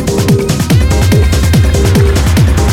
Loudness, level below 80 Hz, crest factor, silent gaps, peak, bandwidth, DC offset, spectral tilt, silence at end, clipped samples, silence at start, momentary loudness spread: -9 LUFS; -14 dBFS; 8 dB; none; 0 dBFS; 17 kHz; under 0.1%; -6 dB/octave; 0 s; under 0.1%; 0 s; 2 LU